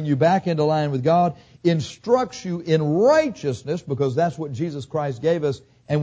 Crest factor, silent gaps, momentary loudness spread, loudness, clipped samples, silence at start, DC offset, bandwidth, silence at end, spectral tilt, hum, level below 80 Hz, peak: 16 dB; none; 10 LU; -22 LUFS; under 0.1%; 0 s; under 0.1%; 8 kHz; 0 s; -7 dB/octave; none; -56 dBFS; -6 dBFS